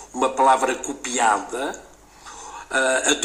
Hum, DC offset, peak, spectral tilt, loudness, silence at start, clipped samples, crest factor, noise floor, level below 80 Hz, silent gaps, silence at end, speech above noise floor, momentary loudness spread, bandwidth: none; under 0.1%; -4 dBFS; -0.5 dB/octave; -21 LUFS; 0 s; under 0.1%; 18 dB; -44 dBFS; -56 dBFS; none; 0 s; 23 dB; 20 LU; 15.5 kHz